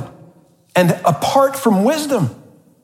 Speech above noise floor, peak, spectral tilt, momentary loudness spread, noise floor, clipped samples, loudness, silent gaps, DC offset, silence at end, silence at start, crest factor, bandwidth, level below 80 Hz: 35 dB; -2 dBFS; -5.5 dB/octave; 6 LU; -49 dBFS; under 0.1%; -16 LUFS; none; under 0.1%; 0.5 s; 0 s; 16 dB; 16.5 kHz; -62 dBFS